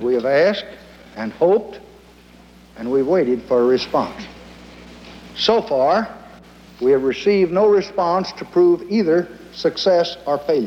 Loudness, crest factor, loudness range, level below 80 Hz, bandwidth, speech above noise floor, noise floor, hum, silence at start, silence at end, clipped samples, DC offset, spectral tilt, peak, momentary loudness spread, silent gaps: -18 LUFS; 16 dB; 4 LU; -52 dBFS; 8.2 kHz; 28 dB; -46 dBFS; 60 Hz at -45 dBFS; 0 s; 0 s; under 0.1%; under 0.1%; -6 dB/octave; -2 dBFS; 16 LU; none